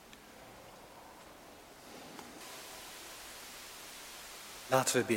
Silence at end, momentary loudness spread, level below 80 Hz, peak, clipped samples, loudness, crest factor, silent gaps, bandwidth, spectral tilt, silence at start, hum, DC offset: 0 s; 21 LU; -70 dBFS; -14 dBFS; under 0.1%; -39 LUFS; 26 dB; none; 17 kHz; -3 dB/octave; 0 s; none; under 0.1%